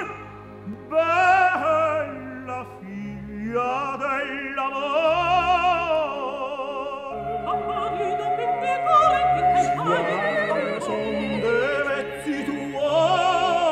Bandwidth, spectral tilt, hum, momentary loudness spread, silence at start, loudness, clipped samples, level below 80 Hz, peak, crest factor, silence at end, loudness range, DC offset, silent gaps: 11.5 kHz; -5 dB/octave; none; 14 LU; 0 s; -22 LUFS; under 0.1%; -50 dBFS; -6 dBFS; 16 dB; 0 s; 4 LU; under 0.1%; none